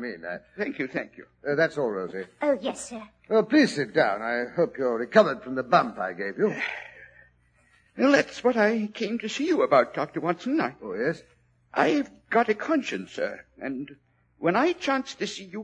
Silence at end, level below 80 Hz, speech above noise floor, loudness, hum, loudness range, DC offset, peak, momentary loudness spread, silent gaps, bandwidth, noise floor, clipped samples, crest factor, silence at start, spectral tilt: 0 s; -68 dBFS; 37 dB; -26 LUFS; none; 4 LU; under 0.1%; -4 dBFS; 14 LU; none; 10 kHz; -63 dBFS; under 0.1%; 22 dB; 0 s; -5 dB/octave